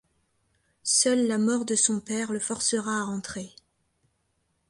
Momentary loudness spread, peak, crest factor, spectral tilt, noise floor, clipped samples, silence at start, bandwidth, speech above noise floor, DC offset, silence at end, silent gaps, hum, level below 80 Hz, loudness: 13 LU; -8 dBFS; 22 dB; -2.5 dB/octave; -74 dBFS; under 0.1%; 0.85 s; 11.5 kHz; 47 dB; under 0.1%; 1.2 s; none; none; -66 dBFS; -25 LUFS